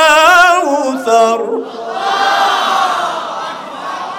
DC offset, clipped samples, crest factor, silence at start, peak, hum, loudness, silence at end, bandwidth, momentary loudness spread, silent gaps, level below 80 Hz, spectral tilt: under 0.1%; under 0.1%; 12 dB; 0 s; 0 dBFS; none; -12 LUFS; 0 s; 18 kHz; 16 LU; none; -54 dBFS; -1 dB/octave